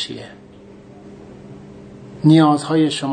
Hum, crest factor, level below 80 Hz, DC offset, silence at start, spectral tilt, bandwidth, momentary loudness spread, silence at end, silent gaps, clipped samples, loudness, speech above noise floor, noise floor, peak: none; 18 dB; -56 dBFS; under 0.1%; 0 s; -6.5 dB/octave; 9.4 kHz; 27 LU; 0 s; none; under 0.1%; -15 LUFS; 26 dB; -41 dBFS; 0 dBFS